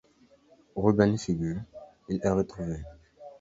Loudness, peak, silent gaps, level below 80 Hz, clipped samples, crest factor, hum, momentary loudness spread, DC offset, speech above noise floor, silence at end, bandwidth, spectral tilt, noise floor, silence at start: -28 LUFS; -8 dBFS; none; -50 dBFS; under 0.1%; 22 dB; none; 21 LU; under 0.1%; 34 dB; 0.05 s; 8 kHz; -7.5 dB/octave; -61 dBFS; 0.75 s